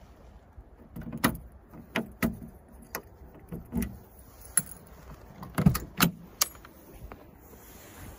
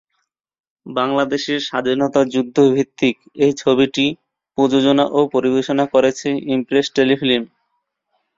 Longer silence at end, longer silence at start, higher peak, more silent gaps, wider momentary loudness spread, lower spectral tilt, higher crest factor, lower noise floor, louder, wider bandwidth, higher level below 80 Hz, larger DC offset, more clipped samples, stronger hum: second, 0 s vs 0.9 s; second, 0 s vs 0.85 s; about the same, -4 dBFS vs -2 dBFS; neither; first, 24 LU vs 6 LU; about the same, -4 dB/octave vs -5 dB/octave; first, 30 dB vs 16 dB; second, -52 dBFS vs -72 dBFS; second, -30 LUFS vs -17 LUFS; first, 16.5 kHz vs 7.6 kHz; first, -48 dBFS vs -58 dBFS; neither; neither; neither